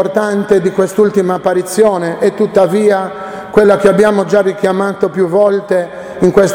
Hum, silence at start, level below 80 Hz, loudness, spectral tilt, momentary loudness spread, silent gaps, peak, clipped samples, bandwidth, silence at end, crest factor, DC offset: none; 0 s; -46 dBFS; -12 LUFS; -6 dB/octave; 6 LU; none; 0 dBFS; 0.2%; 16.5 kHz; 0 s; 12 dB; under 0.1%